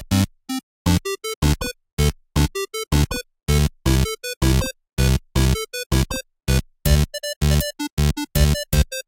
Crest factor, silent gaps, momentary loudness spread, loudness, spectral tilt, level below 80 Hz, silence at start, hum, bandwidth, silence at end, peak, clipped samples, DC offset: 16 dB; 0.63-0.85 s, 1.36-1.42 s, 1.93-1.97 s, 3.43-3.47 s, 4.37-4.41 s, 5.86-5.90 s, 7.36-7.41 s, 7.92-7.97 s; 6 LU; -22 LUFS; -5 dB/octave; -24 dBFS; 0 s; none; 17 kHz; 0.05 s; -4 dBFS; under 0.1%; under 0.1%